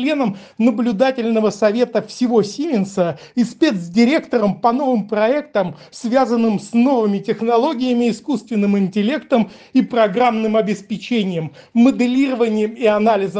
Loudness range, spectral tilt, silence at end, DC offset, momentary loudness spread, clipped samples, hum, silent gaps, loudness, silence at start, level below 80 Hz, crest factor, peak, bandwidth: 1 LU; -6.5 dB/octave; 0 s; under 0.1%; 6 LU; under 0.1%; none; none; -17 LUFS; 0 s; -62 dBFS; 14 dB; -2 dBFS; 9.2 kHz